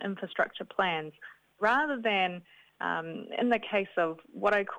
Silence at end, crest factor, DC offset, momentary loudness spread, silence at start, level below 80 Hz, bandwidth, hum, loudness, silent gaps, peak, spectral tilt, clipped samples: 0 s; 18 dB; under 0.1%; 10 LU; 0 s; -72 dBFS; 19 kHz; none; -30 LUFS; none; -12 dBFS; -6 dB/octave; under 0.1%